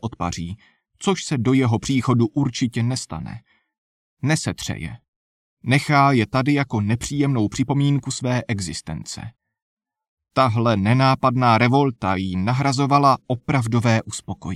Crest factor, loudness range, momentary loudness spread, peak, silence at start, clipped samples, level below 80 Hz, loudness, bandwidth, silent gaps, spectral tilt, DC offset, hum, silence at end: 16 dB; 6 LU; 15 LU; -4 dBFS; 0.05 s; under 0.1%; -50 dBFS; -20 LUFS; 13 kHz; 3.78-4.17 s, 5.08-5.57 s, 9.62-9.77 s, 10.08-10.17 s; -6 dB/octave; under 0.1%; none; 0 s